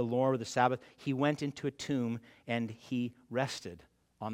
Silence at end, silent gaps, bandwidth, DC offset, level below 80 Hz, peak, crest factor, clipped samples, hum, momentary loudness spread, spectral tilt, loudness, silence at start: 0 s; none; 15 kHz; under 0.1%; -74 dBFS; -12 dBFS; 22 dB; under 0.1%; none; 9 LU; -6 dB/octave; -35 LUFS; 0 s